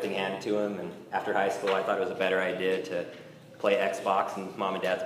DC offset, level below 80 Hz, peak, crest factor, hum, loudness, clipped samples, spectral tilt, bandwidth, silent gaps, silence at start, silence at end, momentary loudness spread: under 0.1%; -78 dBFS; -12 dBFS; 18 dB; none; -29 LUFS; under 0.1%; -4.5 dB/octave; 15.5 kHz; none; 0 s; 0 s; 8 LU